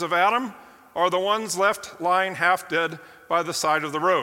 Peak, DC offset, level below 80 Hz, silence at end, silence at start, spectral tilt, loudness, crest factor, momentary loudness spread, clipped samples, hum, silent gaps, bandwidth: -6 dBFS; under 0.1%; -70 dBFS; 0 s; 0 s; -3 dB/octave; -23 LUFS; 18 dB; 8 LU; under 0.1%; none; none; 17 kHz